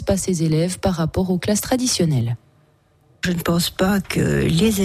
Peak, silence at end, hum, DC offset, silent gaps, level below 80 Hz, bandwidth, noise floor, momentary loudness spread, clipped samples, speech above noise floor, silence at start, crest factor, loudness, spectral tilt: -8 dBFS; 0 s; none; under 0.1%; none; -40 dBFS; 15.5 kHz; -57 dBFS; 5 LU; under 0.1%; 38 dB; 0 s; 12 dB; -20 LUFS; -5 dB/octave